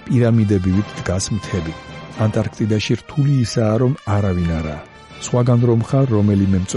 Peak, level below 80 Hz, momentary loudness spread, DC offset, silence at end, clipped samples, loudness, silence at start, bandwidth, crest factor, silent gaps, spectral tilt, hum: -4 dBFS; -40 dBFS; 12 LU; under 0.1%; 0 s; under 0.1%; -18 LUFS; 0 s; 11 kHz; 14 dB; none; -7 dB/octave; none